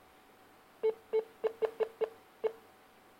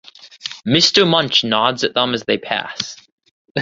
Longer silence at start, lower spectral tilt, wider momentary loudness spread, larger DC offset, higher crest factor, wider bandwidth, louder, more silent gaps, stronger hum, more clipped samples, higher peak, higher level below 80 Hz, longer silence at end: first, 0.85 s vs 0.25 s; about the same, -4.5 dB/octave vs -3.5 dB/octave; second, 5 LU vs 15 LU; neither; about the same, 22 dB vs 18 dB; first, 16 kHz vs 7.8 kHz; second, -37 LUFS vs -16 LUFS; second, none vs 3.12-3.18 s, 3.31-3.45 s, 3.51-3.55 s; neither; neither; second, -16 dBFS vs 0 dBFS; second, -80 dBFS vs -56 dBFS; first, 0.6 s vs 0 s